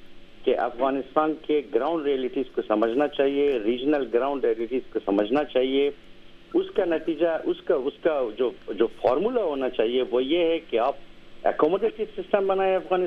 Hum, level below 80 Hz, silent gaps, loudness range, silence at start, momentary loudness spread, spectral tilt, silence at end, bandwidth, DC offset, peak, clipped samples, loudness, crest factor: none; -54 dBFS; none; 1 LU; 0 s; 5 LU; -7 dB/octave; 0 s; 5.6 kHz; under 0.1%; -6 dBFS; under 0.1%; -25 LUFS; 18 dB